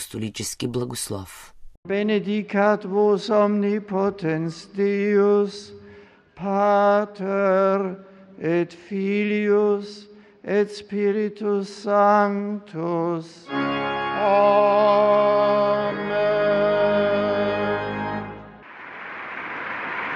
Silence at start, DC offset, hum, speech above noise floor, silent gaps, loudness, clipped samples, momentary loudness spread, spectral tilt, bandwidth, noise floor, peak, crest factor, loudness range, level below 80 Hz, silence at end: 0 s; under 0.1%; none; 27 dB; 1.77-1.83 s; -22 LUFS; under 0.1%; 14 LU; -5.5 dB/octave; 13.5 kHz; -48 dBFS; -6 dBFS; 16 dB; 5 LU; -58 dBFS; 0 s